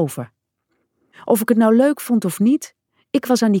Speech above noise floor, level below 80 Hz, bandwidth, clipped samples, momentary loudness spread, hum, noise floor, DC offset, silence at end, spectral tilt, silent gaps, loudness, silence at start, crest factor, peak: 54 dB; -70 dBFS; 18 kHz; under 0.1%; 20 LU; none; -71 dBFS; under 0.1%; 0 s; -6 dB/octave; none; -17 LUFS; 0 s; 16 dB; -4 dBFS